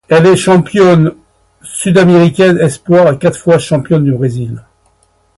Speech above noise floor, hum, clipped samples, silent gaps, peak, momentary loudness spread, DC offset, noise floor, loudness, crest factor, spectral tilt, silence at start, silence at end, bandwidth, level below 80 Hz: 45 dB; none; under 0.1%; none; 0 dBFS; 10 LU; under 0.1%; -53 dBFS; -9 LUFS; 10 dB; -6.5 dB/octave; 0.1 s; 0.8 s; 11.5 kHz; -44 dBFS